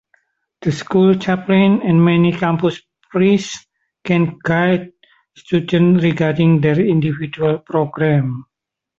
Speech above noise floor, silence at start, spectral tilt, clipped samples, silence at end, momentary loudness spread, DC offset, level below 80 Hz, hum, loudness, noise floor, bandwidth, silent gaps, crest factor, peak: 47 dB; 0.6 s; -7.5 dB/octave; under 0.1%; 0.55 s; 10 LU; under 0.1%; -52 dBFS; none; -16 LUFS; -61 dBFS; 7.8 kHz; none; 14 dB; -2 dBFS